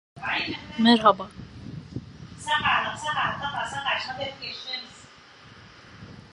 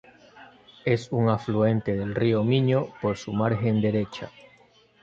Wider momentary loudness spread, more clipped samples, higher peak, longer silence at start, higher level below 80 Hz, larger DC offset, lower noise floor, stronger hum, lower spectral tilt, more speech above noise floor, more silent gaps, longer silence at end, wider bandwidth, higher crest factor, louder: first, 22 LU vs 8 LU; neither; first, -4 dBFS vs -8 dBFS; second, 0.15 s vs 0.35 s; about the same, -56 dBFS vs -56 dBFS; neither; second, -50 dBFS vs -58 dBFS; neither; second, -4 dB/octave vs -8 dB/octave; second, 25 dB vs 34 dB; neither; second, 0.05 s vs 0.75 s; first, 11 kHz vs 7.6 kHz; first, 24 dB vs 18 dB; about the same, -25 LUFS vs -25 LUFS